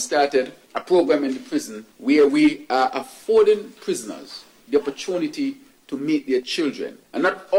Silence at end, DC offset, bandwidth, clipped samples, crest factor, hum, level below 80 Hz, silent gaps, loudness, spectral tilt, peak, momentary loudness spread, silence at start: 0 s; under 0.1%; 16.5 kHz; under 0.1%; 14 dB; none; -64 dBFS; none; -21 LUFS; -4 dB/octave; -6 dBFS; 16 LU; 0 s